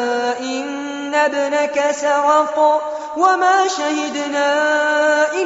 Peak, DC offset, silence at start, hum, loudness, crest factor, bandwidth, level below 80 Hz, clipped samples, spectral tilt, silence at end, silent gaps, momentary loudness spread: -2 dBFS; under 0.1%; 0 s; none; -17 LUFS; 14 dB; 8 kHz; -66 dBFS; under 0.1%; 1 dB/octave; 0 s; none; 8 LU